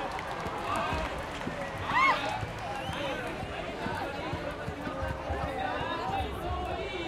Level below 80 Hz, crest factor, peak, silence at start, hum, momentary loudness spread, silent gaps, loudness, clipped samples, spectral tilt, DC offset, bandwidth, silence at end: -46 dBFS; 18 dB; -14 dBFS; 0 s; none; 9 LU; none; -33 LUFS; under 0.1%; -5 dB/octave; under 0.1%; 16.5 kHz; 0 s